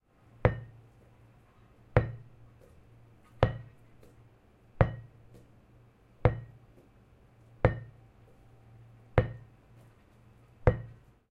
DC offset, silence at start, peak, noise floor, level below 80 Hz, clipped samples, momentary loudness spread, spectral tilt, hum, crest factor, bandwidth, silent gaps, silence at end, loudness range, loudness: under 0.1%; 0.45 s; -4 dBFS; -60 dBFS; -44 dBFS; under 0.1%; 21 LU; -9.5 dB/octave; none; 30 dB; 5.4 kHz; none; 0.4 s; 2 LU; -32 LUFS